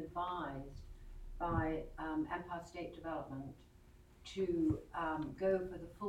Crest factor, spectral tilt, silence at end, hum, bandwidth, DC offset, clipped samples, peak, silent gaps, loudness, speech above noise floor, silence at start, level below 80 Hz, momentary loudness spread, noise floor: 18 dB; -7.5 dB/octave; 0 s; none; 11.5 kHz; under 0.1%; under 0.1%; -22 dBFS; none; -41 LUFS; 22 dB; 0 s; -54 dBFS; 19 LU; -62 dBFS